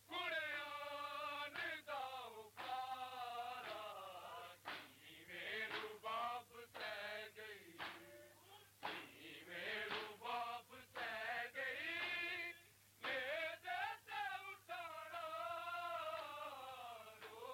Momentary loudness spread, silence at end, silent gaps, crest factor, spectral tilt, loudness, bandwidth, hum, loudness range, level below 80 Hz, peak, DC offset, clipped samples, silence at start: 12 LU; 0 s; none; 16 dB; -2 dB/octave; -47 LUFS; 17 kHz; none; 5 LU; -86 dBFS; -34 dBFS; under 0.1%; under 0.1%; 0 s